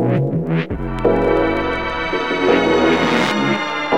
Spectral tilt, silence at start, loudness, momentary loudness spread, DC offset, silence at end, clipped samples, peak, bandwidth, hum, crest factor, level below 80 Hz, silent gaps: -6 dB/octave; 0 s; -17 LUFS; 6 LU; 0.8%; 0 s; under 0.1%; -2 dBFS; 12.5 kHz; none; 14 dB; -34 dBFS; none